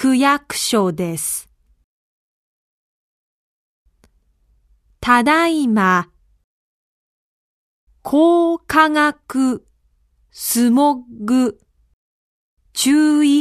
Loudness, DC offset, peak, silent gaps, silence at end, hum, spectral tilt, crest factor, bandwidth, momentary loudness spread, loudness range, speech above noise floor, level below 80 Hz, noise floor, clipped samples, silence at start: -16 LUFS; under 0.1%; 0 dBFS; 1.84-3.86 s, 6.44-7.87 s, 11.93-12.57 s; 0 s; none; -4 dB/octave; 18 dB; 14 kHz; 12 LU; 7 LU; 45 dB; -54 dBFS; -60 dBFS; under 0.1%; 0 s